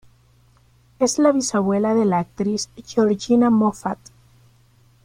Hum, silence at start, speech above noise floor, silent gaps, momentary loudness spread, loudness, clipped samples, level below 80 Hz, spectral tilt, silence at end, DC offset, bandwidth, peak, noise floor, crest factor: none; 1 s; 36 dB; none; 10 LU; -20 LUFS; under 0.1%; -58 dBFS; -5.5 dB/octave; 1.1 s; under 0.1%; 14.5 kHz; -4 dBFS; -55 dBFS; 18 dB